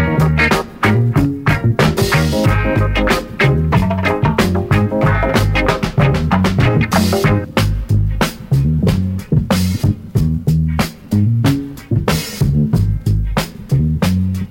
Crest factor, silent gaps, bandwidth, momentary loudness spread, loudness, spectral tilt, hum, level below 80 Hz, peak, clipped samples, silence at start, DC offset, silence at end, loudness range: 14 dB; none; 17 kHz; 4 LU; -15 LUFS; -6.5 dB/octave; none; -24 dBFS; 0 dBFS; under 0.1%; 0 s; under 0.1%; 0 s; 2 LU